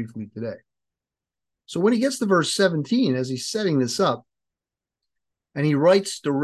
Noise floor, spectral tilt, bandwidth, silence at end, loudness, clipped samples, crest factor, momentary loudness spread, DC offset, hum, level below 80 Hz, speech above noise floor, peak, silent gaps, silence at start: -89 dBFS; -5 dB/octave; 12.5 kHz; 0 s; -22 LUFS; under 0.1%; 18 dB; 14 LU; under 0.1%; none; -68 dBFS; 67 dB; -6 dBFS; none; 0 s